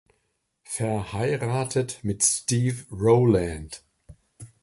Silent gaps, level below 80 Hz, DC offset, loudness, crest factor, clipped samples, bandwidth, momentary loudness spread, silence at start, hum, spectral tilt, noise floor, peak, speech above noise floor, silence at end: none; -48 dBFS; under 0.1%; -24 LUFS; 20 dB; under 0.1%; 11.5 kHz; 14 LU; 0.7 s; none; -5 dB/octave; -74 dBFS; -6 dBFS; 50 dB; 0.15 s